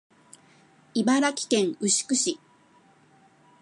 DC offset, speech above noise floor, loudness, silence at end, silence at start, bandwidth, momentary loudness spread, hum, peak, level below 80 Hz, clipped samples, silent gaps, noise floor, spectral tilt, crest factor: under 0.1%; 35 dB; -24 LUFS; 1.25 s; 0.95 s; 11.5 kHz; 7 LU; none; -10 dBFS; -80 dBFS; under 0.1%; none; -59 dBFS; -2.5 dB/octave; 18 dB